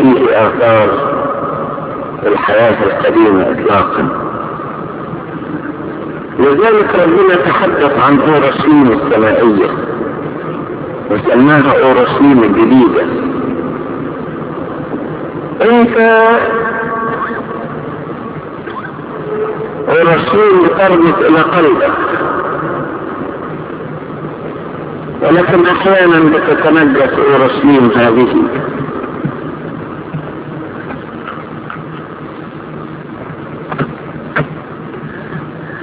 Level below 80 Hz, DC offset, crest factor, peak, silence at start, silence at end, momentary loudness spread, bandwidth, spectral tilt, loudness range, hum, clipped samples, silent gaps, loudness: -42 dBFS; under 0.1%; 12 dB; 0 dBFS; 0 s; 0 s; 16 LU; 4 kHz; -10.5 dB/octave; 13 LU; none; 0.7%; none; -11 LUFS